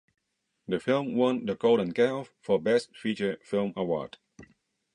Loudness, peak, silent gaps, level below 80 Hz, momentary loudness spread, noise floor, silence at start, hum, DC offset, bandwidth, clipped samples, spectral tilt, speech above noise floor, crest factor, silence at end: -28 LUFS; -12 dBFS; none; -68 dBFS; 9 LU; -67 dBFS; 0.7 s; none; under 0.1%; 10.5 kHz; under 0.1%; -6.5 dB/octave; 39 dB; 18 dB; 0.5 s